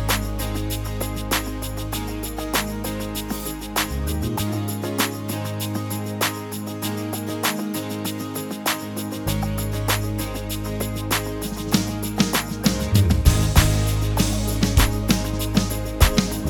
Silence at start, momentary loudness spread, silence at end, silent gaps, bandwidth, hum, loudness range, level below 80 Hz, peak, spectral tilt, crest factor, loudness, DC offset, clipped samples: 0 s; 9 LU; 0 s; none; 20 kHz; none; 6 LU; -30 dBFS; 0 dBFS; -4.5 dB/octave; 22 dB; -23 LUFS; under 0.1%; under 0.1%